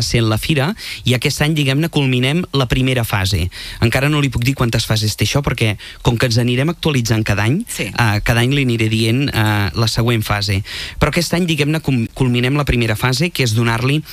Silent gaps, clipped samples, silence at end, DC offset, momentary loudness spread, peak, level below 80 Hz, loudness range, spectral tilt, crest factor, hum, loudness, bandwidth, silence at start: none; under 0.1%; 0 s; under 0.1%; 4 LU; -2 dBFS; -32 dBFS; 1 LU; -5 dB/octave; 14 dB; none; -16 LUFS; 15.5 kHz; 0 s